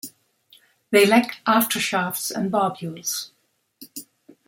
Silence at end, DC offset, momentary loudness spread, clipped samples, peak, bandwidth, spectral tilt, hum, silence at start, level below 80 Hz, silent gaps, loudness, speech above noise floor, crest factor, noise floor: 0.45 s; under 0.1%; 22 LU; under 0.1%; -2 dBFS; 17 kHz; -3.5 dB/octave; none; 0.05 s; -72 dBFS; none; -21 LUFS; 36 dB; 22 dB; -57 dBFS